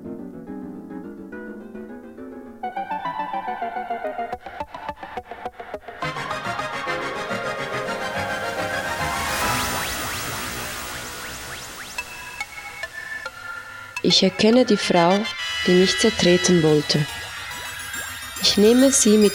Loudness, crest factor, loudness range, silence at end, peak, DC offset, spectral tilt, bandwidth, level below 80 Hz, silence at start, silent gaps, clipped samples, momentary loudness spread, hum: -22 LUFS; 18 dB; 13 LU; 0 s; -4 dBFS; under 0.1%; -3.5 dB/octave; 17.5 kHz; -50 dBFS; 0 s; none; under 0.1%; 19 LU; none